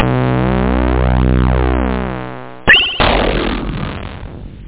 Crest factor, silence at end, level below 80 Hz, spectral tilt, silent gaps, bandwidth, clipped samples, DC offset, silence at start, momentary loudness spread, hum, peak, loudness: 14 dB; 0 s; -20 dBFS; -9.5 dB/octave; none; 4 kHz; under 0.1%; 2%; 0 s; 18 LU; none; 0 dBFS; -14 LUFS